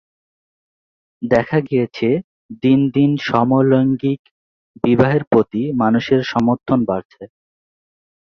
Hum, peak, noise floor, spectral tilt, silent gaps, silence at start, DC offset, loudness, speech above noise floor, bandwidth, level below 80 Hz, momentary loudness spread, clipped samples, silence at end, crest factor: none; -2 dBFS; under -90 dBFS; -8.5 dB/octave; 2.24-2.49 s, 4.19-4.25 s, 4.31-4.74 s, 5.27-5.31 s, 7.05-7.10 s; 1.2 s; under 0.1%; -17 LUFS; over 74 dB; 6.6 kHz; -52 dBFS; 8 LU; under 0.1%; 1 s; 16 dB